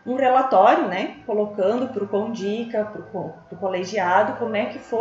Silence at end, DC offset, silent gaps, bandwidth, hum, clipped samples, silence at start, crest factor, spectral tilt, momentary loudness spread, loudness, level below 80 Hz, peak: 0 s; under 0.1%; none; 7.8 kHz; none; under 0.1%; 0.05 s; 18 dB; -3.5 dB/octave; 14 LU; -22 LUFS; -66 dBFS; -2 dBFS